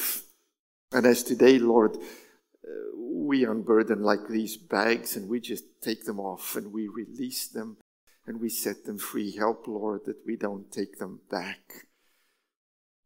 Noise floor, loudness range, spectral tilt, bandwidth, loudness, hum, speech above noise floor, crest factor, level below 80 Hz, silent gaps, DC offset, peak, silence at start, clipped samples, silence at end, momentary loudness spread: -72 dBFS; 10 LU; -4 dB/octave; 16.5 kHz; -28 LUFS; none; 45 dB; 24 dB; -80 dBFS; 0.59-0.88 s, 7.81-8.07 s; under 0.1%; -6 dBFS; 0 s; under 0.1%; 1.25 s; 16 LU